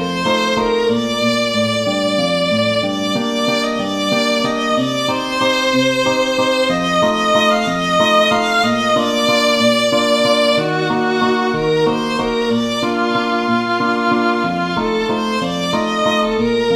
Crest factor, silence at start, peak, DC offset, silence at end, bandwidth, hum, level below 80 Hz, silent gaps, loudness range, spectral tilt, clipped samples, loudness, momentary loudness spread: 14 dB; 0 s; -2 dBFS; under 0.1%; 0 s; 15 kHz; none; -46 dBFS; none; 3 LU; -4 dB/octave; under 0.1%; -16 LUFS; 5 LU